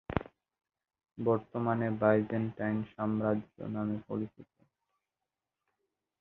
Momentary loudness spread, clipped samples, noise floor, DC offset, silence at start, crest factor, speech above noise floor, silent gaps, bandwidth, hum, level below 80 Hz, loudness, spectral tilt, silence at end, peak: 11 LU; under 0.1%; -90 dBFS; under 0.1%; 0.1 s; 26 dB; 57 dB; none; 4.1 kHz; none; -60 dBFS; -33 LUFS; -11 dB/octave; 1.75 s; -8 dBFS